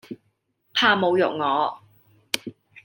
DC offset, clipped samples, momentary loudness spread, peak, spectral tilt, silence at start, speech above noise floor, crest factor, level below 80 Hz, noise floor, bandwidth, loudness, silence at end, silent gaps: under 0.1%; under 0.1%; 23 LU; -2 dBFS; -3.5 dB/octave; 0.1 s; 49 dB; 24 dB; -74 dBFS; -70 dBFS; 17 kHz; -22 LUFS; 0.05 s; none